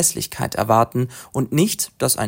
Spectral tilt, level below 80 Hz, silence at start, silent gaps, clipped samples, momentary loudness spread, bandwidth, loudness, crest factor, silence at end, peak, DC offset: -4 dB/octave; -52 dBFS; 0 s; none; under 0.1%; 8 LU; 16.5 kHz; -20 LUFS; 18 dB; 0 s; -2 dBFS; under 0.1%